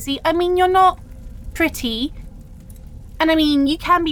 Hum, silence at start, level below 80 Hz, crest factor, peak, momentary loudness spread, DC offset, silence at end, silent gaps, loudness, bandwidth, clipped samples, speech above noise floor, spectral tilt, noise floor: none; 0 s; -36 dBFS; 16 dB; -4 dBFS; 15 LU; under 0.1%; 0 s; none; -17 LUFS; 20 kHz; under 0.1%; 21 dB; -4.5 dB/octave; -37 dBFS